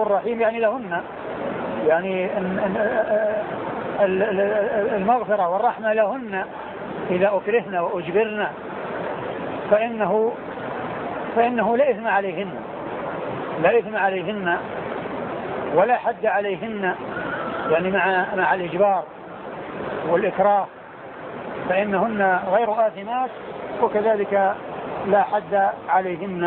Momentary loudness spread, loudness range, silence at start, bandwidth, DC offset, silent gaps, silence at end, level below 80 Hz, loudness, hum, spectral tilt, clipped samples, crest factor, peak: 11 LU; 2 LU; 0 s; 4.3 kHz; under 0.1%; none; 0 s; -58 dBFS; -22 LUFS; none; -10 dB/octave; under 0.1%; 18 dB; -4 dBFS